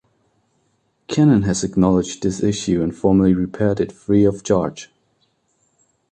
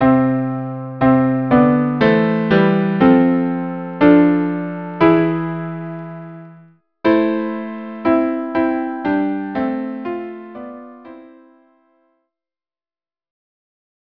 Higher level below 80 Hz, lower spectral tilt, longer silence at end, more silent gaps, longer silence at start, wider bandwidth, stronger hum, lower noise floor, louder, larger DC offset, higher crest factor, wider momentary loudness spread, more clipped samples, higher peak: first, -42 dBFS vs -50 dBFS; second, -6.5 dB/octave vs -10 dB/octave; second, 1.25 s vs 2.8 s; neither; first, 1.1 s vs 0 s; first, 9.4 kHz vs 5.4 kHz; neither; second, -65 dBFS vs under -90 dBFS; about the same, -18 LUFS vs -16 LUFS; neither; about the same, 16 dB vs 18 dB; second, 8 LU vs 17 LU; neither; second, -4 dBFS vs 0 dBFS